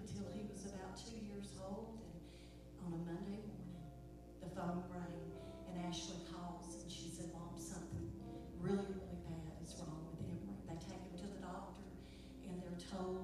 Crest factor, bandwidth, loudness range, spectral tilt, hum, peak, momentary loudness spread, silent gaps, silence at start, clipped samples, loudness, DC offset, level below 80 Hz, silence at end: 20 dB; 14.5 kHz; 3 LU; -6 dB/octave; 60 Hz at -60 dBFS; -30 dBFS; 10 LU; none; 0 s; under 0.1%; -49 LUFS; under 0.1%; -60 dBFS; 0 s